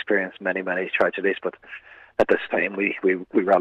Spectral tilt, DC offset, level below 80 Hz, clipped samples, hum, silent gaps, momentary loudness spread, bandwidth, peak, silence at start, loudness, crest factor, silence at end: -7 dB/octave; under 0.1%; -64 dBFS; under 0.1%; none; none; 11 LU; 7.4 kHz; -6 dBFS; 0 s; -23 LUFS; 16 dB; 0 s